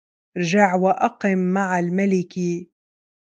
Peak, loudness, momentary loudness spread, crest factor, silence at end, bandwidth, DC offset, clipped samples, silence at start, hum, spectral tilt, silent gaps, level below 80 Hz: -2 dBFS; -20 LUFS; 9 LU; 20 dB; 0.6 s; 7.8 kHz; under 0.1%; under 0.1%; 0.35 s; none; -6.5 dB/octave; none; -70 dBFS